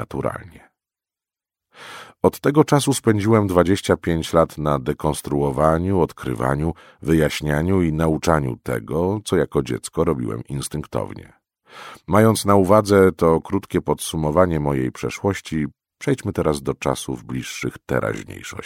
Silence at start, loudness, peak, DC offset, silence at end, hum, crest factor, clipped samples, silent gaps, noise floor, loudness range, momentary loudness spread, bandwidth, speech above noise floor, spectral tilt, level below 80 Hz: 0 s; -20 LUFS; 0 dBFS; under 0.1%; 0 s; none; 20 dB; under 0.1%; none; under -90 dBFS; 6 LU; 12 LU; 16.5 kHz; over 70 dB; -6 dB/octave; -40 dBFS